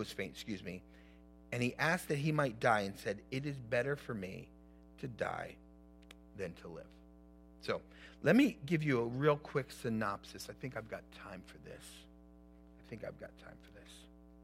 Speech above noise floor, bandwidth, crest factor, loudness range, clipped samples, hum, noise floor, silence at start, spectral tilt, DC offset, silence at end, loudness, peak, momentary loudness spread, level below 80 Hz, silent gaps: 22 dB; 16 kHz; 24 dB; 14 LU; under 0.1%; none; -59 dBFS; 0 s; -6 dB/octave; under 0.1%; 0 s; -37 LUFS; -16 dBFS; 23 LU; -64 dBFS; none